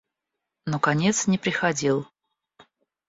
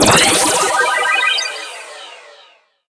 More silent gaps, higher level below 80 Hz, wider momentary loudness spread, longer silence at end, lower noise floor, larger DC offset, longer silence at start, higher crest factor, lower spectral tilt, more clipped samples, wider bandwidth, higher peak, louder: neither; second, -64 dBFS vs -44 dBFS; second, 11 LU vs 22 LU; first, 1.05 s vs 0.7 s; first, -84 dBFS vs -49 dBFS; neither; first, 0.65 s vs 0 s; about the same, 20 dB vs 16 dB; first, -4.5 dB/octave vs -1.5 dB/octave; neither; second, 8 kHz vs 11 kHz; second, -6 dBFS vs 0 dBFS; second, -24 LUFS vs -12 LUFS